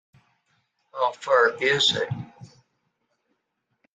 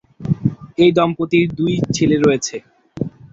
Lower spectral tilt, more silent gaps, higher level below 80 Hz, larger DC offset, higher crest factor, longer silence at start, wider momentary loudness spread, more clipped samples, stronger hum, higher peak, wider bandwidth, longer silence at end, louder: second, -3 dB/octave vs -6 dB/octave; neither; second, -68 dBFS vs -46 dBFS; neither; about the same, 20 dB vs 16 dB; first, 0.95 s vs 0.2 s; first, 18 LU vs 14 LU; neither; neither; second, -6 dBFS vs -2 dBFS; first, 9.4 kHz vs 8 kHz; first, 1.5 s vs 0.05 s; second, -22 LUFS vs -17 LUFS